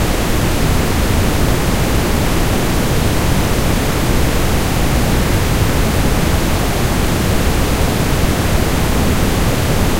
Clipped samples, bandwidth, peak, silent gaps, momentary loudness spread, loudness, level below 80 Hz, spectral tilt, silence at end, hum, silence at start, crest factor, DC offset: under 0.1%; 16 kHz; 0 dBFS; none; 1 LU; -15 LUFS; -18 dBFS; -5 dB/octave; 0 s; none; 0 s; 12 dB; under 0.1%